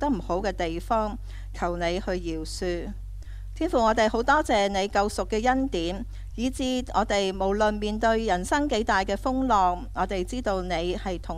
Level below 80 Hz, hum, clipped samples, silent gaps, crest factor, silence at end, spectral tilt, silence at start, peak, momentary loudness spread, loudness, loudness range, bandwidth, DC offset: -38 dBFS; none; under 0.1%; none; 16 dB; 0 s; -5 dB/octave; 0 s; -8 dBFS; 10 LU; -26 LUFS; 4 LU; 14 kHz; under 0.1%